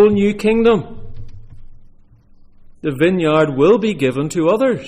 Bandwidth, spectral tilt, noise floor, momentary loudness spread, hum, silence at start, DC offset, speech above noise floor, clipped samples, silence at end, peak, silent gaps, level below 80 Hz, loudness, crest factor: 14.5 kHz; -6.5 dB/octave; -45 dBFS; 12 LU; none; 0 s; under 0.1%; 31 dB; under 0.1%; 0 s; -2 dBFS; none; -40 dBFS; -15 LUFS; 14 dB